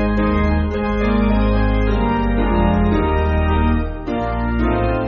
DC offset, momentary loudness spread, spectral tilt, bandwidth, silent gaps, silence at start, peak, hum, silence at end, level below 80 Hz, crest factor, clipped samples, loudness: under 0.1%; 4 LU; -7 dB/octave; 6 kHz; none; 0 s; -4 dBFS; none; 0 s; -22 dBFS; 12 dB; under 0.1%; -18 LUFS